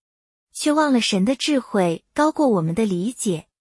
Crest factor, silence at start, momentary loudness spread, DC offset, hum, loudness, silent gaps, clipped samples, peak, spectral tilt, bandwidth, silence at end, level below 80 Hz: 14 dB; 0.55 s; 7 LU; under 0.1%; none; -20 LUFS; none; under 0.1%; -6 dBFS; -5 dB/octave; 12 kHz; 0.2 s; -58 dBFS